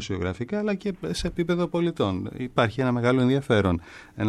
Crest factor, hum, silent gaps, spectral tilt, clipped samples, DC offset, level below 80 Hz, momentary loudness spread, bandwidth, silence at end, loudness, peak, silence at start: 16 dB; none; none; -6.5 dB/octave; under 0.1%; under 0.1%; -46 dBFS; 8 LU; 12.5 kHz; 0 s; -25 LUFS; -8 dBFS; 0 s